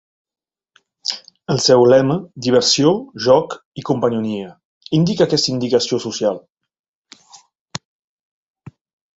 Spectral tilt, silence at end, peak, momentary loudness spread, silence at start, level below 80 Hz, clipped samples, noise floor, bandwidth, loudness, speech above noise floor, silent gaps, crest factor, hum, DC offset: -5 dB/octave; 1.4 s; 0 dBFS; 18 LU; 1.05 s; -58 dBFS; under 0.1%; under -90 dBFS; 8 kHz; -16 LUFS; over 74 dB; 3.65-3.72 s, 4.65-4.81 s, 6.52-6.56 s, 6.79-7.05 s, 7.59-7.66 s; 18 dB; none; under 0.1%